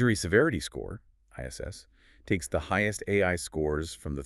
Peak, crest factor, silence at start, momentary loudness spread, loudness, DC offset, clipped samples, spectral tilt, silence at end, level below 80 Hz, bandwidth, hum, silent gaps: -8 dBFS; 20 dB; 0 s; 18 LU; -29 LUFS; under 0.1%; under 0.1%; -5 dB/octave; 0 s; -46 dBFS; 13.5 kHz; none; none